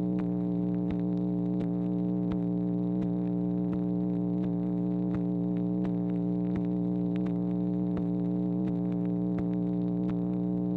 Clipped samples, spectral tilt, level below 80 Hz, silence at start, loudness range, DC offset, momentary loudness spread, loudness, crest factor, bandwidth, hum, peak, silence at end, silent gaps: under 0.1%; -12 dB/octave; -54 dBFS; 0 s; 0 LU; under 0.1%; 0 LU; -30 LUFS; 10 dB; 4 kHz; 60 Hz at -40 dBFS; -20 dBFS; 0 s; none